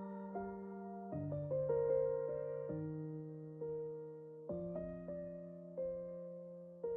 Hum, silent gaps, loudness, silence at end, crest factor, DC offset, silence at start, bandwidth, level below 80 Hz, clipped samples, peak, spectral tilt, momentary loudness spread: none; none; -43 LUFS; 0 s; 16 dB; under 0.1%; 0 s; 2.8 kHz; -70 dBFS; under 0.1%; -26 dBFS; -8 dB/octave; 13 LU